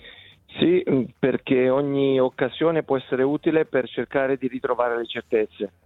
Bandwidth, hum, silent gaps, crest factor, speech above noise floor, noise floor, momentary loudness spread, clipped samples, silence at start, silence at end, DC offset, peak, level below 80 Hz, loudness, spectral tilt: 4.1 kHz; none; none; 18 dB; 25 dB; -47 dBFS; 5 LU; under 0.1%; 0.05 s; 0.15 s; under 0.1%; -4 dBFS; -60 dBFS; -23 LUFS; -9 dB/octave